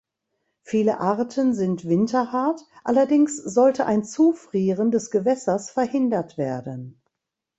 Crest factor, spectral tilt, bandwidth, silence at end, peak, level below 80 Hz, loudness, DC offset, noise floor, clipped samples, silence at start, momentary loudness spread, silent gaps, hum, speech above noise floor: 16 dB; -6.5 dB/octave; 8.2 kHz; 0.65 s; -6 dBFS; -66 dBFS; -22 LUFS; under 0.1%; -84 dBFS; under 0.1%; 0.7 s; 9 LU; none; none; 62 dB